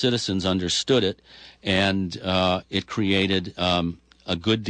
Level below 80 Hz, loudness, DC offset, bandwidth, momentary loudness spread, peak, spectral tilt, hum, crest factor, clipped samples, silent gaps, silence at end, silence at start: -52 dBFS; -23 LUFS; under 0.1%; 9.8 kHz; 9 LU; -10 dBFS; -4.5 dB/octave; none; 14 dB; under 0.1%; none; 0 s; 0 s